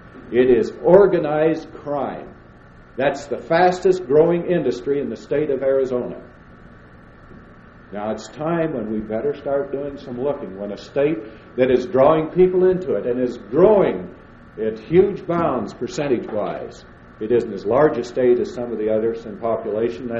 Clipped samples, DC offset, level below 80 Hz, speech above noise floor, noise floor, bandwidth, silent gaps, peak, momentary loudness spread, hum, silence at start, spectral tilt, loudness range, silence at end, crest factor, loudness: under 0.1%; under 0.1%; -48 dBFS; 26 dB; -45 dBFS; 7.8 kHz; none; -2 dBFS; 13 LU; none; 0.05 s; -7.5 dB/octave; 8 LU; 0 s; 18 dB; -20 LUFS